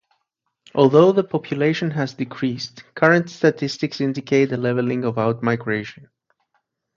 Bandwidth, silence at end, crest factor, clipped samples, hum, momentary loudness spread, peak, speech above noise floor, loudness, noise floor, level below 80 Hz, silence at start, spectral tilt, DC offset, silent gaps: 7.6 kHz; 1.05 s; 20 dB; under 0.1%; none; 11 LU; 0 dBFS; 56 dB; -20 LUFS; -75 dBFS; -64 dBFS; 0.75 s; -6.5 dB/octave; under 0.1%; none